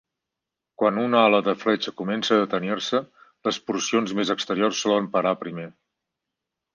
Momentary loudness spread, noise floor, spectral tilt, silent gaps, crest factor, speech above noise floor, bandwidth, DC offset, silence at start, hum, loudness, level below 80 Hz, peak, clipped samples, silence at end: 9 LU; -86 dBFS; -4 dB/octave; none; 20 dB; 63 dB; 10 kHz; under 0.1%; 0.8 s; none; -23 LUFS; -70 dBFS; -4 dBFS; under 0.1%; 1.05 s